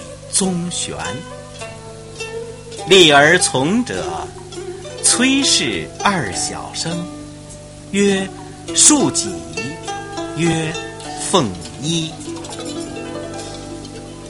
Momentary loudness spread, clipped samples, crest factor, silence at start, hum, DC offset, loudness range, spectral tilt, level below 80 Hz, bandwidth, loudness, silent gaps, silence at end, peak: 21 LU; under 0.1%; 18 dB; 0 s; 50 Hz at -40 dBFS; under 0.1%; 7 LU; -2.5 dB/octave; -46 dBFS; 11.5 kHz; -16 LUFS; none; 0 s; 0 dBFS